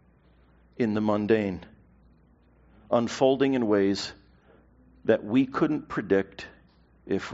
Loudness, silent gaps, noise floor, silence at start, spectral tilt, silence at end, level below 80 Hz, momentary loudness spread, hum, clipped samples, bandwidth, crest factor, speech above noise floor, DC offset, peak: -26 LUFS; none; -59 dBFS; 0.8 s; -5 dB/octave; 0 s; -60 dBFS; 12 LU; none; under 0.1%; 7.6 kHz; 20 dB; 34 dB; under 0.1%; -8 dBFS